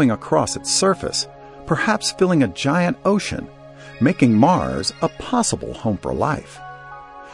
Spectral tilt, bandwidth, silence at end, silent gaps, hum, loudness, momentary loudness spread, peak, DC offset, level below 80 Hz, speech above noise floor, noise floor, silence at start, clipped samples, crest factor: -4.5 dB/octave; 11.5 kHz; 0 s; none; none; -19 LUFS; 21 LU; -2 dBFS; under 0.1%; -46 dBFS; 19 dB; -38 dBFS; 0 s; under 0.1%; 18 dB